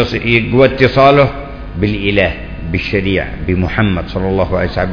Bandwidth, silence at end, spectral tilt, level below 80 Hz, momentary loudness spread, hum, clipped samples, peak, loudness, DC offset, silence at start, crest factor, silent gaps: 5.4 kHz; 0 s; -8 dB/octave; -28 dBFS; 10 LU; none; 0.4%; 0 dBFS; -13 LUFS; under 0.1%; 0 s; 14 dB; none